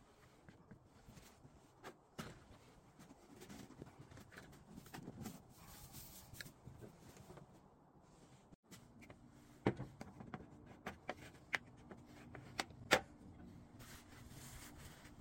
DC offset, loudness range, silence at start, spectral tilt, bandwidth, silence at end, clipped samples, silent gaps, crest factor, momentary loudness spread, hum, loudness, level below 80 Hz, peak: under 0.1%; 15 LU; 0 s; -4 dB/octave; 16.5 kHz; 0 s; under 0.1%; 8.55-8.63 s; 38 dB; 21 LU; none; -49 LUFS; -70 dBFS; -14 dBFS